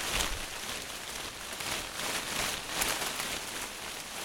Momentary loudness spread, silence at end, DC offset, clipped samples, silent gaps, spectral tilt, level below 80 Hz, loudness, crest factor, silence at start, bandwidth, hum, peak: 7 LU; 0 s; under 0.1%; under 0.1%; none; -1 dB/octave; -50 dBFS; -34 LUFS; 26 dB; 0 s; 18 kHz; none; -10 dBFS